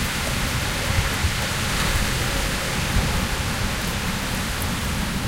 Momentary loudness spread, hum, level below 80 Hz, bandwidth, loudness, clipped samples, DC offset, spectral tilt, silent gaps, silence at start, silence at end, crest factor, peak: 3 LU; none; -30 dBFS; 17 kHz; -23 LUFS; under 0.1%; under 0.1%; -3.5 dB/octave; none; 0 s; 0 s; 16 dB; -8 dBFS